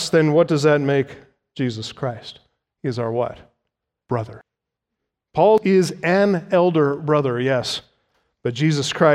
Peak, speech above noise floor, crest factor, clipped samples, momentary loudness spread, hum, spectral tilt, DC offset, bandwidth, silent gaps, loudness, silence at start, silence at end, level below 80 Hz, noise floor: -2 dBFS; 64 dB; 18 dB; under 0.1%; 13 LU; none; -6 dB/octave; under 0.1%; 13.5 kHz; none; -20 LUFS; 0 s; 0 s; -60 dBFS; -82 dBFS